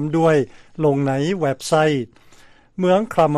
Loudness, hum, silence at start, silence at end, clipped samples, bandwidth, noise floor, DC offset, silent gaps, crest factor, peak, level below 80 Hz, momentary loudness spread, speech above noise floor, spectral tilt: -19 LUFS; none; 0 s; 0 s; under 0.1%; 13.5 kHz; -48 dBFS; under 0.1%; none; 14 dB; -4 dBFS; -54 dBFS; 10 LU; 30 dB; -6.5 dB/octave